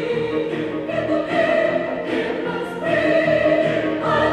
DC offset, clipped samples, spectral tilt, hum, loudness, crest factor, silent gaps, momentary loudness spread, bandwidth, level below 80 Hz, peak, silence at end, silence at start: under 0.1%; under 0.1%; -6.5 dB/octave; none; -20 LUFS; 14 dB; none; 7 LU; 10 kHz; -50 dBFS; -6 dBFS; 0 s; 0 s